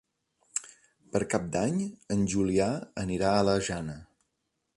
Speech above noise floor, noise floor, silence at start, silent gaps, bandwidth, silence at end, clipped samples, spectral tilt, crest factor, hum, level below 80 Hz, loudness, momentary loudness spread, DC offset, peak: 52 dB; -80 dBFS; 0.55 s; none; 11.5 kHz; 0.75 s; under 0.1%; -5.5 dB/octave; 20 dB; none; -54 dBFS; -29 LUFS; 10 LU; under 0.1%; -10 dBFS